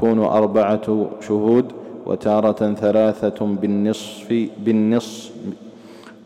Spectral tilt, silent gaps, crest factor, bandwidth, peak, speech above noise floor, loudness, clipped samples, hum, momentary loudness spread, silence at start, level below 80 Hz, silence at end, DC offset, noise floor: -7 dB/octave; none; 14 dB; 12 kHz; -6 dBFS; 23 dB; -19 LUFS; under 0.1%; none; 15 LU; 0 s; -60 dBFS; 0.15 s; under 0.1%; -41 dBFS